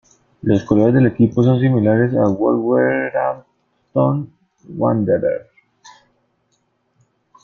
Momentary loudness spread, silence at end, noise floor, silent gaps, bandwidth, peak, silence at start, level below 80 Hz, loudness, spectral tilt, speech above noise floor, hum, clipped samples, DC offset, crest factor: 11 LU; 2 s; -65 dBFS; none; 6.8 kHz; -2 dBFS; 0.45 s; -52 dBFS; -17 LUFS; -9.5 dB/octave; 50 dB; none; under 0.1%; under 0.1%; 16 dB